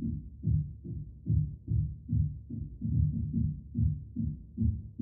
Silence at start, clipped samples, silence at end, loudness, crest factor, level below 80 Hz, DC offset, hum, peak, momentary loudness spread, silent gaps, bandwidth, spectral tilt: 0 s; under 0.1%; 0 s; -34 LUFS; 16 dB; -40 dBFS; under 0.1%; none; -16 dBFS; 9 LU; none; 0.7 kHz; -18.5 dB/octave